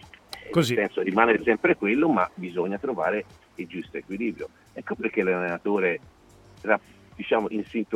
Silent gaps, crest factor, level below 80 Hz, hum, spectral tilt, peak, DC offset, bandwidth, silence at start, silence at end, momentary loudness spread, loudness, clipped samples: none; 22 dB; -60 dBFS; none; -6 dB/octave; -4 dBFS; under 0.1%; 17 kHz; 0.3 s; 0 s; 16 LU; -25 LUFS; under 0.1%